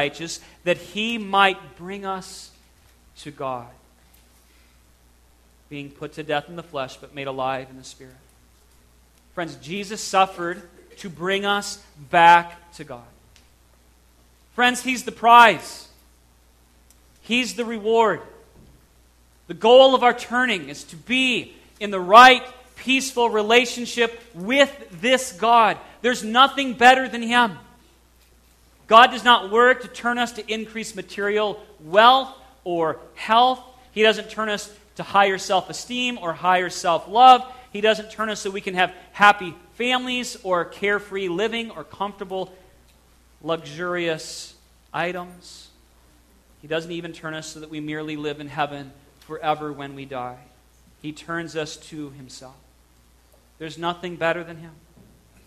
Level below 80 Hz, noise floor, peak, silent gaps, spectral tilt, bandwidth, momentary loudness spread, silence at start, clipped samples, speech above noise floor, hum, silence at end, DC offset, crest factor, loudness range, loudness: -58 dBFS; -56 dBFS; 0 dBFS; none; -3 dB/octave; 14 kHz; 22 LU; 0 s; under 0.1%; 35 dB; none; 0.75 s; under 0.1%; 22 dB; 16 LU; -20 LUFS